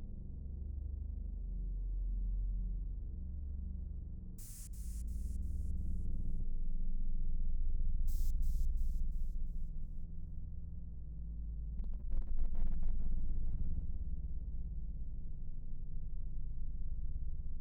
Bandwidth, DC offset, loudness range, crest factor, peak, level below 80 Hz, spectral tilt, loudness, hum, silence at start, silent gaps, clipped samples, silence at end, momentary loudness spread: 9.4 kHz; under 0.1%; 4 LU; 12 dB; -22 dBFS; -36 dBFS; -8 dB/octave; -45 LUFS; none; 0 s; none; under 0.1%; 0 s; 8 LU